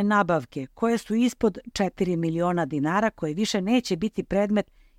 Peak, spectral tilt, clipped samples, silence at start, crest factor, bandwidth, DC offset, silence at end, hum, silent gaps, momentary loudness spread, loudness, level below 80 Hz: -8 dBFS; -6 dB/octave; under 0.1%; 0 s; 16 dB; 15.5 kHz; under 0.1%; 0.35 s; none; none; 5 LU; -25 LUFS; -52 dBFS